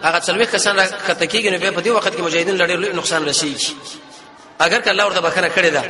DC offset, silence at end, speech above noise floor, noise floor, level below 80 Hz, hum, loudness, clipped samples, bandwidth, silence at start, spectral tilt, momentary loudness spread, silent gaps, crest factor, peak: under 0.1%; 0 s; 24 dB; -41 dBFS; -58 dBFS; none; -16 LUFS; under 0.1%; 11.5 kHz; 0 s; -2 dB/octave; 5 LU; none; 18 dB; 0 dBFS